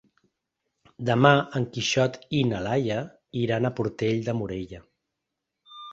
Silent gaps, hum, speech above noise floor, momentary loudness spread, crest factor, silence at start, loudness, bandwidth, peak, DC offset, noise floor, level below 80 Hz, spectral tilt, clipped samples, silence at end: none; none; 59 dB; 15 LU; 24 dB; 1 s; -25 LUFS; 8 kHz; -2 dBFS; under 0.1%; -83 dBFS; -56 dBFS; -5.5 dB/octave; under 0.1%; 0 s